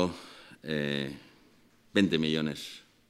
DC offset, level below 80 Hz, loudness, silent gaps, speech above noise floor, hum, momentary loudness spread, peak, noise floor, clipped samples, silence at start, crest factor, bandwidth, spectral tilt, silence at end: under 0.1%; -64 dBFS; -31 LUFS; none; 32 dB; none; 19 LU; -10 dBFS; -62 dBFS; under 0.1%; 0 s; 22 dB; 15 kHz; -5.5 dB/octave; 0.3 s